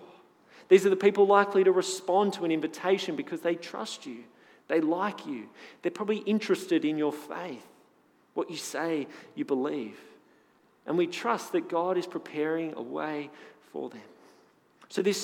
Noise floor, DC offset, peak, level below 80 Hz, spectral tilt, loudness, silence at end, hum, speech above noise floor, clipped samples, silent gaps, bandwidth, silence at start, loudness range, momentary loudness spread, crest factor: -64 dBFS; under 0.1%; -8 dBFS; under -90 dBFS; -5 dB/octave; -29 LUFS; 0 s; none; 36 dB; under 0.1%; none; 15.5 kHz; 0 s; 10 LU; 18 LU; 22 dB